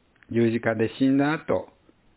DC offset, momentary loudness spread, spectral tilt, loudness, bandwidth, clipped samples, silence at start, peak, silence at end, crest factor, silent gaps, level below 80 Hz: under 0.1%; 7 LU; -11 dB/octave; -24 LUFS; 4 kHz; under 0.1%; 0.3 s; -8 dBFS; 0.5 s; 18 dB; none; -58 dBFS